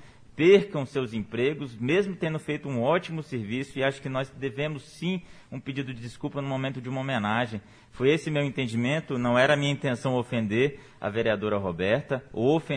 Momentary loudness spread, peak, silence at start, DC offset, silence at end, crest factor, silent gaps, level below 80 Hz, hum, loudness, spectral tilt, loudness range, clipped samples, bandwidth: 11 LU; -8 dBFS; 0 s; under 0.1%; 0 s; 20 dB; none; -58 dBFS; none; -27 LUFS; -6.5 dB/octave; 6 LU; under 0.1%; 10.5 kHz